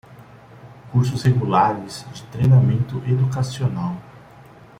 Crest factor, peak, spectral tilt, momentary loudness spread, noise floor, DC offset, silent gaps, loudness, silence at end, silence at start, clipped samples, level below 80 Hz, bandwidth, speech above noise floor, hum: 16 dB; -4 dBFS; -7.5 dB/octave; 17 LU; -45 dBFS; under 0.1%; none; -20 LUFS; 0.35 s; 0.1 s; under 0.1%; -50 dBFS; 10.5 kHz; 26 dB; none